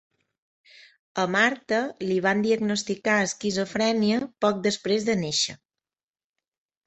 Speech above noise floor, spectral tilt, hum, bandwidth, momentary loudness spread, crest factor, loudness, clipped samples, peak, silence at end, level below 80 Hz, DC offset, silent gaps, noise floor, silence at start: over 66 dB; -4 dB/octave; none; 8.2 kHz; 5 LU; 20 dB; -24 LUFS; under 0.1%; -6 dBFS; 1.3 s; -66 dBFS; under 0.1%; none; under -90 dBFS; 1.15 s